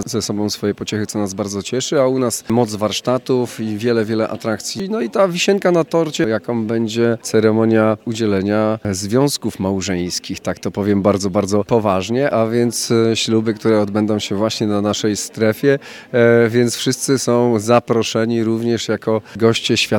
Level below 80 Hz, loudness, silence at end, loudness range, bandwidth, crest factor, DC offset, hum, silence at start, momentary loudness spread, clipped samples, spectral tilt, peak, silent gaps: -58 dBFS; -17 LUFS; 0 s; 3 LU; 17.5 kHz; 16 dB; under 0.1%; none; 0 s; 7 LU; under 0.1%; -5 dB/octave; 0 dBFS; none